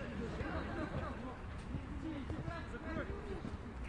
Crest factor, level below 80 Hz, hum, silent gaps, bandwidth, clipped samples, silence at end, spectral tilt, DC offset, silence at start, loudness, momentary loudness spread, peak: 14 dB; -50 dBFS; none; none; 11 kHz; under 0.1%; 0 s; -7.5 dB/octave; under 0.1%; 0 s; -44 LUFS; 4 LU; -28 dBFS